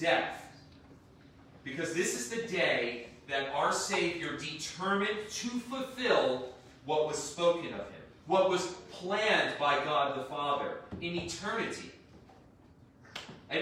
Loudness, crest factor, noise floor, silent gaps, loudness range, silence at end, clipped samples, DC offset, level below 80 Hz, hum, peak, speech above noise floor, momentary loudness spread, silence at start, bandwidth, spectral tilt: -32 LUFS; 22 dB; -59 dBFS; none; 4 LU; 0 s; under 0.1%; under 0.1%; -68 dBFS; none; -12 dBFS; 26 dB; 16 LU; 0 s; 16 kHz; -3 dB/octave